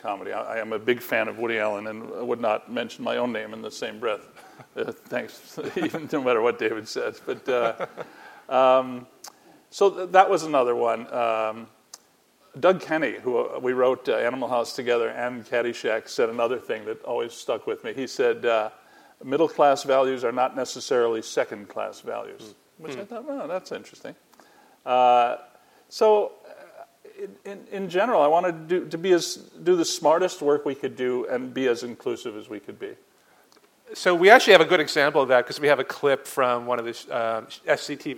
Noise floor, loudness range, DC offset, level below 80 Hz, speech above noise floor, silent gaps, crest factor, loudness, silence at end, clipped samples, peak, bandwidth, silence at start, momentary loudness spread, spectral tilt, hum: -60 dBFS; 10 LU; under 0.1%; -76 dBFS; 37 dB; none; 24 dB; -24 LUFS; 0 s; under 0.1%; 0 dBFS; 17 kHz; 0.05 s; 17 LU; -4 dB/octave; none